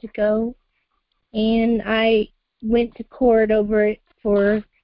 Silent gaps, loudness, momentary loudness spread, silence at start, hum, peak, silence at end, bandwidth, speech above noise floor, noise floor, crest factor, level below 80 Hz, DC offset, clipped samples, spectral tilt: none; -20 LUFS; 11 LU; 0.05 s; none; -6 dBFS; 0.2 s; 5.4 kHz; 53 dB; -71 dBFS; 14 dB; -44 dBFS; under 0.1%; under 0.1%; -10.5 dB/octave